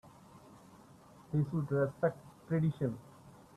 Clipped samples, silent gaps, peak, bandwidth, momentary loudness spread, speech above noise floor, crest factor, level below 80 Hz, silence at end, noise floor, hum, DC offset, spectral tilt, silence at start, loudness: under 0.1%; none; -18 dBFS; 12 kHz; 16 LU; 25 dB; 18 dB; -68 dBFS; 0.25 s; -58 dBFS; none; under 0.1%; -9.5 dB/octave; 0.05 s; -35 LUFS